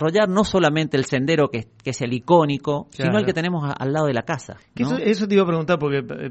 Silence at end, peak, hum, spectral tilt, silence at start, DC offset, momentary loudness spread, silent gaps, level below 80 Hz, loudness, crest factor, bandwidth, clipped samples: 0 s; -2 dBFS; none; -6 dB/octave; 0 s; under 0.1%; 9 LU; none; -52 dBFS; -21 LUFS; 18 dB; 8.4 kHz; under 0.1%